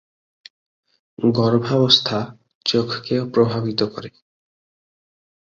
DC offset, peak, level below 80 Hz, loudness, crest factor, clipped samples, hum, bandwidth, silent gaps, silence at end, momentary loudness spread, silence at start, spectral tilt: under 0.1%; 0 dBFS; -58 dBFS; -19 LUFS; 22 dB; under 0.1%; none; 7.4 kHz; 2.55-2.61 s; 1.5 s; 12 LU; 1.2 s; -6 dB/octave